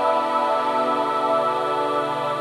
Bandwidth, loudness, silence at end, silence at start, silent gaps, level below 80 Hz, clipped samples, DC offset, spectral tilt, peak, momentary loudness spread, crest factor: 14.5 kHz; -21 LUFS; 0 s; 0 s; none; -74 dBFS; under 0.1%; under 0.1%; -5 dB/octave; -8 dBFS; 2 LU; 14 dB